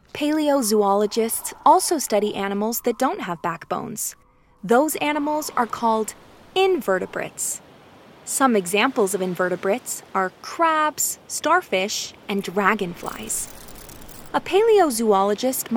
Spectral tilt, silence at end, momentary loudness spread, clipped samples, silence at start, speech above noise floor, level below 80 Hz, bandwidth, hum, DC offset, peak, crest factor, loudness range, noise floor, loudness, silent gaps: -3 dB/octave; 0 s; 10 LU; under 0.1%; 0.15 s; 26 dB; -56 dBFS; over 20 kHz; none; under 0.1%; -2 dBFS; 20 dB; 3 LU; -48 dBFS; -21 LUFS; none